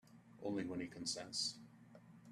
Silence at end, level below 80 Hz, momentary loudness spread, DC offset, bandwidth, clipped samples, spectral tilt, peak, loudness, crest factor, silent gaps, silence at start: 0 s; -80 dBFS; 21 LU; under 0.1%; 14 kHz; under 0.1%; -3 dB/octave; -28 dBFS; -43 LUFS; 18 dB; none; 0.05 s